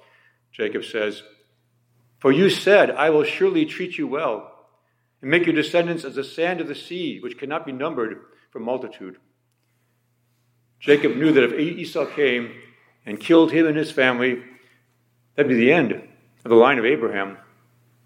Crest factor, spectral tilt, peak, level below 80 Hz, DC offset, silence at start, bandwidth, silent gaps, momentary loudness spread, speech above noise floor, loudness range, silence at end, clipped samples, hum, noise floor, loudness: 20 dB; -6 dB/octave; -2 dBFS; -74 dBFS; under 0.1%; 0.55 s; 13.5 kHz; none; 16 LU; 48 dB; 8 LU; 0.7 s; under 0.1%; none; -68 dBFS; -20 LUFS